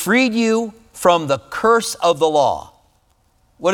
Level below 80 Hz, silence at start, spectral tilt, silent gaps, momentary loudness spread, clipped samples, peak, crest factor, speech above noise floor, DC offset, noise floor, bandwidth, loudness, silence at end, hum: -54 dBFS; 0 s; -4 dB/octave; none; 7 LU; under 0.1%; 0 dBFS; 18 dB; 43 dB; under 0.1%; -59 dBFS; 19.5 kHz; -17 LUFS; 0 s; none